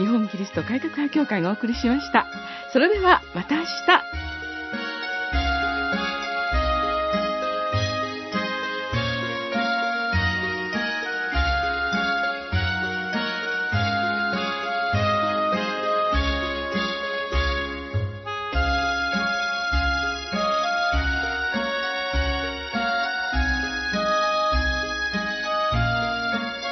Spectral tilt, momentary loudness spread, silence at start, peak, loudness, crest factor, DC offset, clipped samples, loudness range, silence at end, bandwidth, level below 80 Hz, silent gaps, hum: -5 dB/octave; 6 LU; 0 s; -2 dBFS; -24 LUFS; 22 dB; under 0.1%; under 0.1%; 3 LU; 0 s; 6.2 kHz; -34 dBFS; none; none